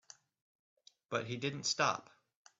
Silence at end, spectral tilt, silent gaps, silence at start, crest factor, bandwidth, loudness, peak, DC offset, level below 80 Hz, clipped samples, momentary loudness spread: 0.6 s; -3 dB/octave; none; 1.1 s; 24 dB; 8.2 kHz; -36 LUFS; -18 dBFS; under 0.1%; -80 dBFS; under 0.1%; 8 LU